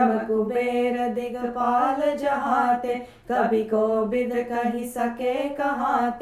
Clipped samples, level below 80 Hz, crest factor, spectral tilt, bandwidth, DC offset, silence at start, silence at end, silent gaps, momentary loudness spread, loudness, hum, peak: under 0.1%; -56 dBFS; 14 dB; -6 dB/octave; 15 kHz; under 0.1%; 0 s; 0 s; none; 6 LU; -24 LUFS; none; -8 dBFS